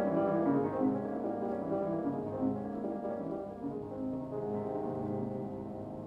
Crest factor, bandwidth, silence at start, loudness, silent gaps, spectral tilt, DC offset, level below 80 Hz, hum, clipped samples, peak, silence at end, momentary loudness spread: 16 dB; 5.2 kHz; 0 s; -35 LUFS; none; -10.5 dB/octave; under 0.1%; -64 dBFS; none; under 0.1%; -18 dBFS; 0 s; 9 LU